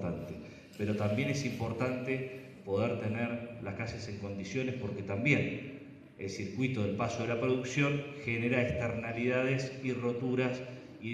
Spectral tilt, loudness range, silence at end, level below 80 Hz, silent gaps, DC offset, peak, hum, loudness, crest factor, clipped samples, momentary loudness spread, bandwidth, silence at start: -6.5 dB/octave; 4 LU; 0 s; -62 dBFS; none; under 0.1%; -14 dBFS; none; -34 LUFS; 20 dB; under 0.1%; 12 LU; 13.5 kHz; 0 s